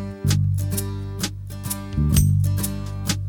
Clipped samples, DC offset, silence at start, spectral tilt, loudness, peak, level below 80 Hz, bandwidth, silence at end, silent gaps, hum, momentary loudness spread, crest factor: under 0.1%; under 0.1%; 0 s; -5 dB/octave; -23 LUFS; -4 dBFS; -32 dBFS; 19.5 kHz; 0 s; none; 50 Hz at -45 dBFS; 11 LU; 18 dB